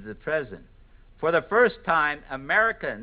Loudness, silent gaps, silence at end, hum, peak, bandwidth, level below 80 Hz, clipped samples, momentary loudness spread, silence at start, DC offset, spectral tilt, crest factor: -24 LUFS; none; 0 s; none; -8 dBFS; 5 kHz; -52 dBFS; under 0.1%; 8 LU; 0 s; under 0.1%; -8.5 dB/octave; 18 dB